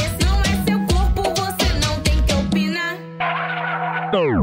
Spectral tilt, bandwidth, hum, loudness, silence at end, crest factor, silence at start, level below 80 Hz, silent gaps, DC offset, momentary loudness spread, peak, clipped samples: -5 dB/octave; 16 kHz; none; -20 LUFS; 0 s; 12 dB; 0 s; -24 dBFS; none; under 0.1%; 4 LU; -6 dBFS; under 0.1%